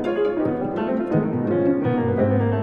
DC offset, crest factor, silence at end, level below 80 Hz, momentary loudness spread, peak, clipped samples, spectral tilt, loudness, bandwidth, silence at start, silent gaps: under 0.1%; 14 dB; 0 s; -52 dBFS; 4 LU; -8 dBFS; under 0.1%; -10.5 dB/octave; -22 LUFS; 5.2 kHz; 0 s; none